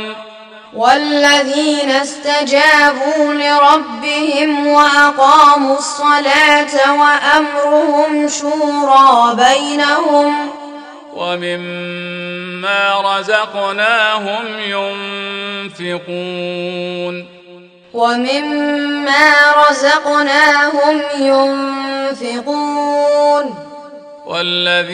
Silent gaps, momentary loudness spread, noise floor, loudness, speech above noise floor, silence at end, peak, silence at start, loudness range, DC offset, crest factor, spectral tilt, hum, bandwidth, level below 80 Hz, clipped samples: none; 15 LU; -40 dBFS; -12 LUFS; 27 dB; 0 s; 0 dBFS; 0 s; 9 LU; under 0.1%; 12 dB; -2.5 dB/octave; none; 13.5 kHz; -60 dBFS; 0.1%